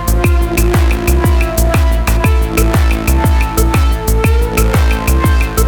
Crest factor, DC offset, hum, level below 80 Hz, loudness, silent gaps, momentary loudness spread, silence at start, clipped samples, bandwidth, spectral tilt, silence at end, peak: 10 dB; under 0.1%; none; -12 dBFS; -13 LUFS; none; 1 LU; 0 s; under 0.1%; 18 kHz; -5.5 dB/octave; 0 s; 0 dBFS